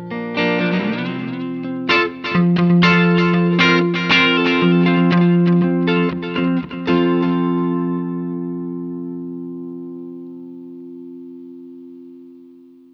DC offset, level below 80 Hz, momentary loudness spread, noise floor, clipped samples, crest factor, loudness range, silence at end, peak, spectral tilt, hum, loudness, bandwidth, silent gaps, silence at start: under 0.1%; -54 dBFS; 22 LU; -44 dBFS; under 0.1%; 16 dB; 18 LU; 0.5 s; -2 dBFS; -7 dB/octave; none; -16 LUFS; 6.2 kHz; none; 0 s